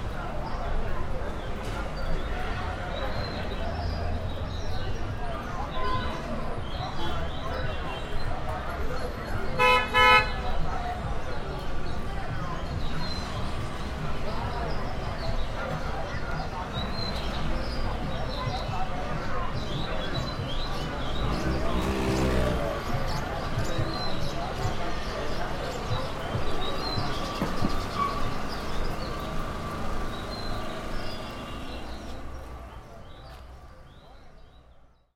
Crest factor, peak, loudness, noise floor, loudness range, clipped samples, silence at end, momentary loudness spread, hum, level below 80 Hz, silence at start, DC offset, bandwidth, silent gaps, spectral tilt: 22 dB; -6 dBFS; -31 LUFS; -55 dBFS; 10 LU; under 0.1%; 0.3 s; 7 LU; none; -34 dBFS; 0 s; under 0.1%; 13.5 kHz; none; -5.5 dB/octave